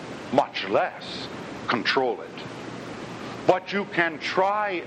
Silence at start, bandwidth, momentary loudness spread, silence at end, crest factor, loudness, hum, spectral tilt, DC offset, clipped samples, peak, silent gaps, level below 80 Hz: 0 s; 11 kHz; 13 LU; 0 s; 24 dB; -26 LUFS; none; -5 dB/octave; under 0.1%; under 0.1%; -2 dBFS; none; -64 dBFS